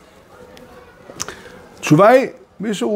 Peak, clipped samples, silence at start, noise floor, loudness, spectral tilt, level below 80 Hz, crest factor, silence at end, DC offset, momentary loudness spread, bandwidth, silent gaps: 0 dBFS; under 0.1%; 1.15 s; -44 dBFS; -15 LUFS; -5.5 dB/octave; -56 dBFS; 18 dB; 0 s; under 0.1%; 19 LU; 16 kHz; none